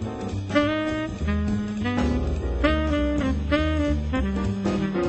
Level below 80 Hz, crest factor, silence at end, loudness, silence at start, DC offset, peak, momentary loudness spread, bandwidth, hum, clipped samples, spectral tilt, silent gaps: -30 dBFS; 18 dB; 0 s; -25 LUFS; 0 s; under 0.1%; -6 dBFS; 4 LU; 8.4 kHz; none; under 0.1%; -7 dB/octave; none